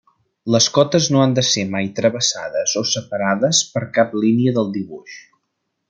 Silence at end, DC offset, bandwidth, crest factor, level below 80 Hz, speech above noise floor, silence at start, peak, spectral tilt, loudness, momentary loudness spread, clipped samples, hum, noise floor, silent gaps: 0.7 s; under 0.1%; 10 kHz; 18 dB; -62 dBFS; 56 dB; 0.45 s; -2 dBFS; -4 dB/octave; -17 LUFS; 8 LU; under 0.1%; none; -74 dBFS; none